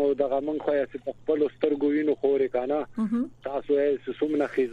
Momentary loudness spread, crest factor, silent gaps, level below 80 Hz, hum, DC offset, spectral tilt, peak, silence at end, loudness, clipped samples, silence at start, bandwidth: 5 LU; 16 dB; none; -62 dBFS; none; under 0.1%; -7.5 dB/octave; -10 dBFS; 0 s; -27 LUFS; under 0.1%; 0 s; 4.8 kHz